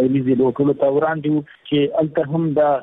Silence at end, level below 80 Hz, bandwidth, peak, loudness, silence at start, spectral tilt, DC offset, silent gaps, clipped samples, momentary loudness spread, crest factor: 0 s; -58 dBFS; 3.9 kHz; -8 dBFS; -19 LUFS; 0 s; -10.5 dB/octave; under 0.1%; none; under 0.1%; 5 LU; 10 dB